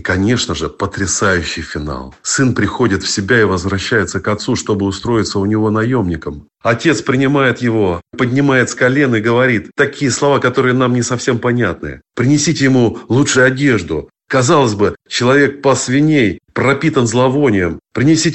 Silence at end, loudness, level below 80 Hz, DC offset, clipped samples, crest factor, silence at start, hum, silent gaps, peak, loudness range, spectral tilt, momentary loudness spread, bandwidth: 0 s; -14 LUFS; -40 dBFS; under 0.1%; under 0.1%; 14 dB; 0 s; none; none; 0 dBFS; 3 LU; -5 dB/octave; 7 LU; 8.4 kHz